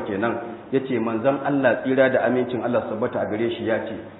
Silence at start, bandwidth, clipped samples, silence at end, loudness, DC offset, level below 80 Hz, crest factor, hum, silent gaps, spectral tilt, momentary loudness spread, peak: 0 s; 4.1 kHz; under 0.1%; 0 s; -23 LUFS; under 0.1%; -64 dBFS; 18 dB; none; none; -11 dB/octave; 7 LU; -6 dBFS